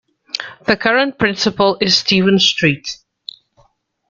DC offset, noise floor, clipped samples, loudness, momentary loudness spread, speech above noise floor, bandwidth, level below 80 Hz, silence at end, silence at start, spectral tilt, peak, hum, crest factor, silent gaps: under 0.1%; -57 dBFS; under 0.1%; -14 LUFS; 18 LU; 42 dB; 7.6 kHz; -52 dBFS; 1.15 s; 0.35 s; -4 dB/octave; 0 dBFS; none; 16 dB; none